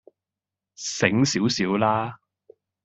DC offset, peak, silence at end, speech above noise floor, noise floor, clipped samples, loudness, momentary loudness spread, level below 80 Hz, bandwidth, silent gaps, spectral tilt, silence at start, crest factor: under 0.1%; -2 dBFS; 0.7 s; 66 dB; -88 dBFS; under 0.1%; -23 LUFS; 12 LU; -62 dBFS; 8.2 kHz; none; -4.5 dB/octave; 0.8 s; 22 dB